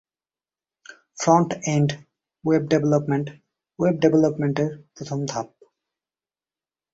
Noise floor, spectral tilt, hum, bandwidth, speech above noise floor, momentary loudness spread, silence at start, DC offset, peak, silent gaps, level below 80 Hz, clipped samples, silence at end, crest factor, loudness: under -90 dBFS; -6.5 dB/octave; none; 8 kHz; over 69 dB; 16 LU; 0.9 s; under 0.1%; -4 dBFS; none; -62 dBFS; under 0.1%; 1.45 s; 20 dB; -22 LUFS